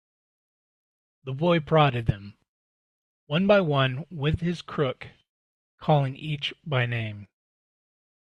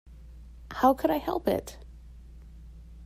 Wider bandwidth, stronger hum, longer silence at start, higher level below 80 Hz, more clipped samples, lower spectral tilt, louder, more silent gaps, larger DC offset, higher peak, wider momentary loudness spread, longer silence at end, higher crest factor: second, 8.2 kHz vs 16 kHz; neither; first, 1.25 s vs 0.05 s; about the same, -52 dBFS vs -48 dBFS; neither; first, -7.5 dB/octave vs -6 dB/octave; about the same, -25 LUFS vs -27 LUFS; first, 2.49-3.27 s, 5.29-5.78 s vs none; neither; first, -6 dBFS vs -10 dBFS; second, 17 LU vs 26 LU; first, 1 s vs 0 s; about the same, 20 dB vs 22 dB